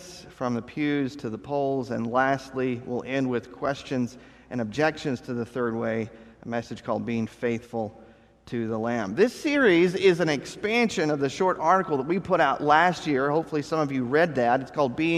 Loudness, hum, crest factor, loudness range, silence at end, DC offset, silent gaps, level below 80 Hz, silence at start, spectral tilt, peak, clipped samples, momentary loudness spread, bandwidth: -26 LUFS; none; 20 dB; 7 LU; 0 s; under 0.1%; none; -60 dBFS; 0 s; -6 dB/octave; -4 dBFS; under 0.1%; 12 LU; 13 kHz